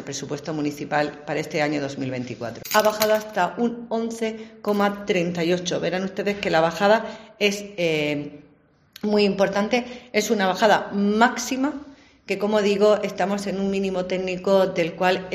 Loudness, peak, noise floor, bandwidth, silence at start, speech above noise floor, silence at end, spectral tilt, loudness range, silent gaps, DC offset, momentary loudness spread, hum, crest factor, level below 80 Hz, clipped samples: -23 LUFS; -2 dBFS; -57 dBFS; 15 kHz; 0 s; 35 dB; 0 s; -4.5 dB/octave; 3 LU; none; under 0.1%; 10 LU; none; 20 dB; -58 dBFS; under 0.1%